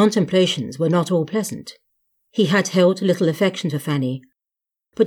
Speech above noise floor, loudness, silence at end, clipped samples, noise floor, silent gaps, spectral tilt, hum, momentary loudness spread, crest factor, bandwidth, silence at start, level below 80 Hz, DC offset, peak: 68 dB; -20 LUFS; 0 s; under 0.1%; -87 dBFS; none; -5.5 dB/octave; none; 13 LU; 16 dB; 17 kHz; 0 s; -68 dBFS; under 0.1%; -4 dBFS